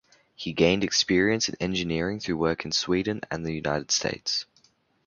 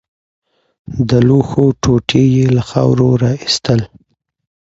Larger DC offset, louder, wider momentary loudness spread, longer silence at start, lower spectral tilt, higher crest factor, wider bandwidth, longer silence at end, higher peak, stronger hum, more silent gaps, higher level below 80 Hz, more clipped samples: neither; second, -26 LUFS vs -13 LUFS; first, 9 LU vs 6 LU; second, 0.4 s vs 0.9 s; second, -3.5 dB/octave vs -6.5 dB/octave; first, 22 dB vs 14 dB; about the same, 7.4 kHz vs 8 kHz; second, 0.65 s vs 0.85 s; second, -6 dBFS vs 0 dBFS; neither; neither; second, -52 dBFS vs -38 dBFS; neither